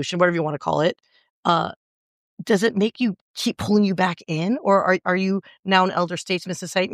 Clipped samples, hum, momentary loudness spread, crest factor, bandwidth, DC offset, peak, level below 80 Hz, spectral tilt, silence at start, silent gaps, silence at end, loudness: under 0.1%; none; 8 LU; 18 dB; 14.5 kHz; under 0.1%; -4 dBFS; -62 dBFS; -5.5 dB/octave; 0 s; 1.30-1.43 s, 1.76-2.37 s, 3.21-3.34 s, 5.59-5.63 s; 0 s; -22 LUFS